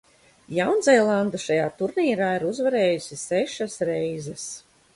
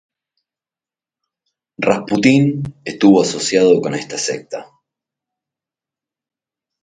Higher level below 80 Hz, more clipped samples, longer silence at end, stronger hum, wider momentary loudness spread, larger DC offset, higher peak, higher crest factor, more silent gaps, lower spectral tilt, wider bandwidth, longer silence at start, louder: second, -64 dBFS vs -56 dBFS; neither; second, 0.35 s vs 2.2 s; neither; about the same, 13 LU vs 14 LU; neither; second, -4 dBFS vs 0 dBFS; about the same, 18 dB vs 18 dB; neither; about the same, -4.5 dB/octave vs -5 dB/octave; first, 11.5 kHz vs 9.4 kHz; second, 0.5 s vs 1.8 s; second, -23 LUFS vs -15 LUFS